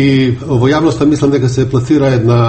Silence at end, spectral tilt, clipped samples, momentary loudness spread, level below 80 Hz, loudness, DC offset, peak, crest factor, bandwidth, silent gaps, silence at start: 0 s; -7.5 dB/octave; under 0.1%; 3 LU; -36 dBFS; -11 LUFS; under 0.1%; 0 dBFS; 10 dB; 8.6 kHz; none; 0 s